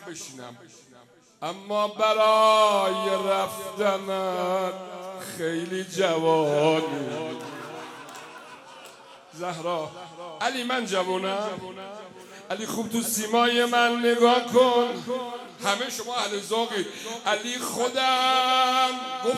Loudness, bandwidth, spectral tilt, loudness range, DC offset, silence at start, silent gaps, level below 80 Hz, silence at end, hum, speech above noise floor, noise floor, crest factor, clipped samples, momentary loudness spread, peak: -24 LUFS; 15.5 kHz; -3 dB/octave; 8 LU; under 0.1%; 0 s; none; -76 dBFS; 0 s; none; 23 dB; -48 dBFS; 20 dB; under 0.1%; 20 LU; -6 dBFS